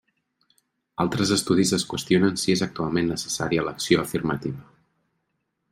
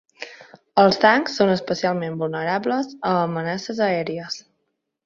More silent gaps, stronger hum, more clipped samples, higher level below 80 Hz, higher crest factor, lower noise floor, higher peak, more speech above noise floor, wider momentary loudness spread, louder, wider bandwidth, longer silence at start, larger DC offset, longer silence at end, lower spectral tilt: neither; neither; neither; first, -56 dBFS vs -62 dBFS; about the same, 20 dB vs 20 dB; about the same, -76 dBFS vs -75 dBFS; second, -6 dBFS vs -2 dBFS; about the same, 53 dB vs 55 dB; second, 7 LU vs 15 LU; second, -24 LUFS vs -21 LUFS; first, 16 kHz vs 7.6 kHz; first, 1 s vs 0.2 s; neither; first, 1.1 s vs 0.65 s; about the same, -4.5 dB/octave vs -5.5 dB/octave